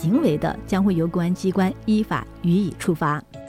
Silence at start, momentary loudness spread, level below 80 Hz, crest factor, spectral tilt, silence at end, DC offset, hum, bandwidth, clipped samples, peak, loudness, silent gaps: 0 s; 5 LU; -44 dBFS; 14 dB; -7.5 dB/octave; 0 s; under 0.1%; none; 15.5 kHz; under 0.1%; -8 dBFS; -22 LUFS; none